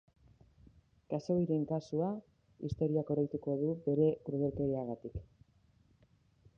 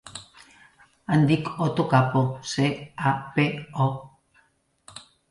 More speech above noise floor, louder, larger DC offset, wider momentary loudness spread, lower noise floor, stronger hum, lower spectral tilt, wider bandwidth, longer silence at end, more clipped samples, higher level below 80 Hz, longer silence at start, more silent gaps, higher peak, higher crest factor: second, 35 dB vs 42 dB; second, -35 LUFS vs -24 LUFS; neither; second, 13 LU vs 21 LU; first, -69 dBFS vs -65 dBFS; neither; first, -10 dB/octave vs -6.5 dB/octave; second, 7.2 kHz vs 11.5 kHz; first, 1.35 s vs 0.3 s; neither; about the same, -60 dBFS vs -60 dBFS; first, 1.1 s vs 0.05 s; neither; second, -18 dBFS vs -6 dBFS; about the same, 18 dB vs 20 dB